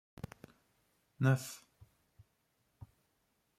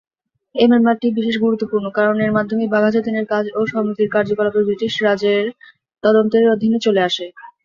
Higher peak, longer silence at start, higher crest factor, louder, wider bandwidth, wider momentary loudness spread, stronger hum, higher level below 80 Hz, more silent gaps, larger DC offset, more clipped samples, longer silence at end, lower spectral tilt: second, -18 dBFS vs -2 dBFS; first, 1.2 s vs 0.55 s; first, 22 dB vs 14 dB; second, -35 LUFS vs -17 LUFS; first, 15 kHz vs 7.4 kHz; first, 27 LU vs 6 LU; neither; second, -70 dBFS vs -60 dBFS; neither; neither; neither; first, 2 s vs 0.15 s; about the same, -6.5 dB/octave vs -6 dB/octave